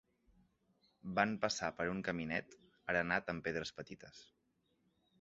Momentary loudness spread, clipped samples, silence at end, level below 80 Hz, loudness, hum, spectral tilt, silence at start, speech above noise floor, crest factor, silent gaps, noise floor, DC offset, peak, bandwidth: 17 LU; under 0.1%; 0.95 s; -68 dBFS; -38 LUFS; none; -3.5 dB/octave; 1.05 s; 40 dB; 26 dB; none; -80 dBFS; under 0.1%; -16 dBFS; 7.6 kHz